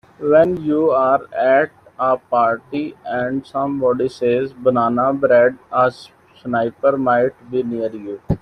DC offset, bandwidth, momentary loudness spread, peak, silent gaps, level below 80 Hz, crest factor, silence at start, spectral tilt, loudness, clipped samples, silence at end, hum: under 0.1%; 9.8 kHz; 10 LU; -2 dBFS; none; -50 dBFS; 16 dB; 0.2 s; -8 dB/octave; -18 LUFS; under 0.1%; 0.05 s; none